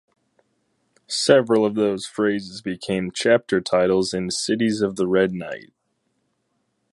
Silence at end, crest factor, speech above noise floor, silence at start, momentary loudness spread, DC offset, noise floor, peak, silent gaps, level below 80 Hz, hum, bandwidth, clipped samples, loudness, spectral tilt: 1.3 s; 22 dB; 51 dB; 1.1 s; 11 LU; under 0.1%; -72 dBFS; -2 dBFS; none; -58 dBFS; none; 11.5 kHz; under 0.1%; -21 LUFS; -4.5 dB/octave